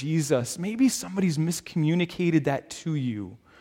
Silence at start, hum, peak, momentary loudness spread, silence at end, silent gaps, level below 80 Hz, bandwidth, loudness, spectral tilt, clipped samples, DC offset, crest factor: 0 s; none; -10 dBFS; 7 LU; 0.25 s; none; -62 dBFS; 16.5 kHz; -26 LUFS; -5.5 dB/octave; under 0.1%; under 0.1%; 16 dB